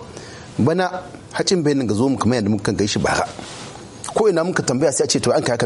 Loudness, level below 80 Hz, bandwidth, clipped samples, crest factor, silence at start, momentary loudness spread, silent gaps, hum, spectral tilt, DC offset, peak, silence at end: -19 LUFS; -48 dBFS; 11.5 kHz; under 0.1%; 14 dB; 0 s; 15 LU; none; none; -4.5 dB/octave; under 0.1%; -6 dBFS; 0 s